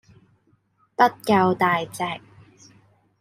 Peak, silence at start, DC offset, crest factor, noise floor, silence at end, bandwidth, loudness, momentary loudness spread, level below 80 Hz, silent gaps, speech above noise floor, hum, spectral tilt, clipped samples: -4 dBFS; 1 s; under 0.1%; 20 dB; -64 dBFS; 1 s; 16 kHz; -21 LUFS; 15 LU; -66 dBFS; none; 43 dB; none; -5.5 dB/octave; under 0.1%